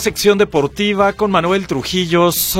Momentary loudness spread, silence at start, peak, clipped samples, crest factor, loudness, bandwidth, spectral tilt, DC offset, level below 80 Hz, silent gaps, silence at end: 5 LU; 0 s; 0 dBFS; under 0.1%; 14 dB; -15 LUFS; 16.5 kHz; -4 dB/octave; under 0.1%; -42 dBFS; none; 0 s